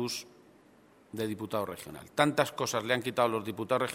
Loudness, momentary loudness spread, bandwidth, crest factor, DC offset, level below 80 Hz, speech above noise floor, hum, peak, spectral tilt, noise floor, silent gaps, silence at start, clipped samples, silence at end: -31 LUFS; 11 LU; 16 kHz; 26 dB; under 0.1%; -70 dBFS; 29 dB; none; -8 dBFS; -4 dB/octave; -60 dBFS; none; 0 s; under 0.1%; 0 s